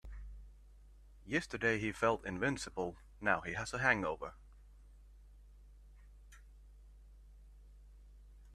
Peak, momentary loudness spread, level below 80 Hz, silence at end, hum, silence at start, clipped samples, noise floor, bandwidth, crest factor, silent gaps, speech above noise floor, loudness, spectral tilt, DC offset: -14 dBFS; 21 LU; -56 dBFS; 0 s; 50 Hz at -60 dBFS; 0.05 s; under 0.1%; -59 dBFS; 13.5 kHz; 26 dB; none; 23 dB; -36 LUFS; -5 dB/octave; under 0.1%